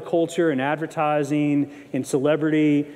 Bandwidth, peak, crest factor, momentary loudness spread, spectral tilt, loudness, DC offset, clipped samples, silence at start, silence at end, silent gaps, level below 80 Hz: 13 kHz; -8 dBFS; 14 dB; 5 LU; -6.5 dB/octave; -22 LUFS; under 0.1%; under 0.1%; 0 s; 0 s; none; -72 dBFS